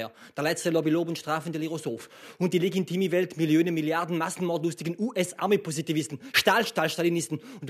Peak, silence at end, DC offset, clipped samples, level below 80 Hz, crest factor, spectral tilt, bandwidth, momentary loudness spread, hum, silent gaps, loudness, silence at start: -8 dBFS; 0 s; under 0.1%; under 0.1%; -72 dBFS; 20 dB; -4.5 dB/octave; 14 kHz; 9 LU; none; none; -27 LUFS; 0 s